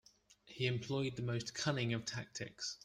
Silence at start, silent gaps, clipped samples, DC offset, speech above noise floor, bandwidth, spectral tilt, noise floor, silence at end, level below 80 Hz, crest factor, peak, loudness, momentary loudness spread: 0.3 s; none; under 0.1%; under 0.1%; 25 dB; 10.5 kHz; -4.5 dB/octave; -64 dBFS; 0.1 s; -70 dBFS; 20 dB; -22 dBFS; -40 LUFS; 7 LU